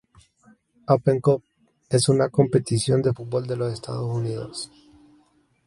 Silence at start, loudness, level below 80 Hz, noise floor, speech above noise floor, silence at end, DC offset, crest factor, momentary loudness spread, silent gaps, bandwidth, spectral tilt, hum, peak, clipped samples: 0.9 s; -23 LUFS; -56 dBFS; -62 dBFS; 40 dB; 1 s; under 0.1%; 20 dB; 12 LU; none; 11.5 kHz; -6 dB/octave; none; -4 dBFS; under 0.1%